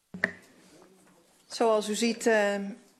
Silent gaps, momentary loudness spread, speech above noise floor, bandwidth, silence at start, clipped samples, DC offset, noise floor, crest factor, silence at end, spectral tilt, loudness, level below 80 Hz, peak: none; 8 LU; 35 dB; 13.5 kHz; 0.15 s; under 0.1%; under 0.1%; -61 dBFS; 22 dB; 0.25 s; -3.5 dB/octave; -27 LUFS; -76 dBFS; -8 dBFS